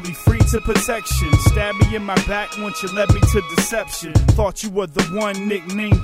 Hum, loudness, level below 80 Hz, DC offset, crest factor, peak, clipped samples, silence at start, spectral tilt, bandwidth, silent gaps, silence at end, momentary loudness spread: none; -19 LUFS; -24 dBFS; under 0.1%; 16 dB; -2 dBFS; under 0.1%; 0 s; -5.5 dB/octave; 16 kHz; none; 0 s; 7 LU